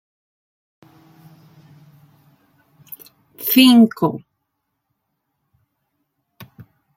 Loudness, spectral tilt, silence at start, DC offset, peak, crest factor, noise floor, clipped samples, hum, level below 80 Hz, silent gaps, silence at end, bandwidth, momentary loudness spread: -14 LUFS; -4.5 dB/octave; 3.4 s; under 0.1%; -2 dBFS; 20 dB; -75 dBFS; under 0.1%; none; -68 dBFS; none; 2.8 s; 16.5 kHz; 28 LU